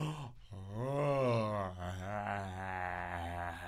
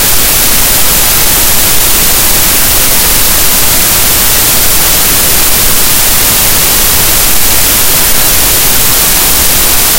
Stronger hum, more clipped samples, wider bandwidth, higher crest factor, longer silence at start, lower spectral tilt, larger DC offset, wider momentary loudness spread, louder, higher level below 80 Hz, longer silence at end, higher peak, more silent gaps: neither; second, under 0.1% vs 6%; second, 15 kHz vs over 20 kHz; first, 14 dB vs 6 dB; about the same, 0 s vs 0 s; first, -7 dB/octave vs -1 dB/octave; neither; first, 13 LU vs 0 LU; second, -38 LUFS vs -4 LUFS; second, -58 dBFS vs -18 dBFS; about the same, 0 s vs 0 s; second, -24 dBFS vs 0 dBFS; neither